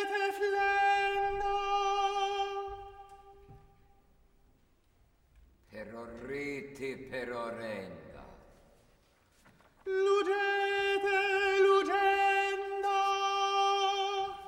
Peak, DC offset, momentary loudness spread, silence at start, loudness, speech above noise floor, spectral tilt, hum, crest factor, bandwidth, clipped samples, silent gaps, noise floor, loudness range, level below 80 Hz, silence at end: -16 dBFS; under 0.1%; 18 LU; 0 s; -31 LUFS; 32 dB; -3 dB/octave; none; 18 dB; 13.5 kHz; under 0.1%; none; -67 dBFS; 16 LU; -60 dBFS; 0 s